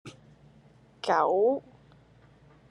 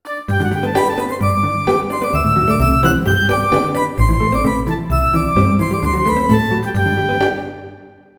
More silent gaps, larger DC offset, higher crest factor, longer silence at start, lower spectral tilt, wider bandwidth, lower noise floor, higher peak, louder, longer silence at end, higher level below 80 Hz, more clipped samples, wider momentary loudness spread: neither; neither; about the same, 20 dB vs 16 dB; about the same, 0.05 s vs 0.05 s; about the same, -5.5 dB/octave vs -6.5 dB/octave; second, 11 kHz vs over 20 kHz; first, -58 dBFS vs -40 dBFS; second, -10 dBFS vs 0 dBFS; second, -27 LUFS vs -16 LUFS; first, 1.1 s vs 0.3 s; second, -68 dBFS vs -26 dBFS; neither; first, 14 LU vs 5 LU